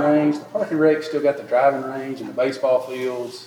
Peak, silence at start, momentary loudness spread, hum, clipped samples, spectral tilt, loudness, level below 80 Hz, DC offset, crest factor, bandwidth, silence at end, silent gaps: -6 dBFS; 0 s; 9 LU; none; under 0.1%; -6.5 dB/octave; -21 LUFS; -82 dBFS; under 0.1%; 16 dB; 14.5 kHz; 0 s; none